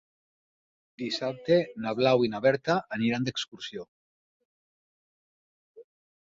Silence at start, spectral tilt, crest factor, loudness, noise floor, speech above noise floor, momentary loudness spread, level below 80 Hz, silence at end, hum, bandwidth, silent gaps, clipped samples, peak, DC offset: 1 s; -5.5 dB/octave; 20 dB; -27 LUFS; under -90 dBFS; over 63 dB; 14 LU; -70 dBFS; 0.4 s; none; 7.8 kHz; 3.88-5.75 s; under 0.1%; -10 dBFS; under 0.1%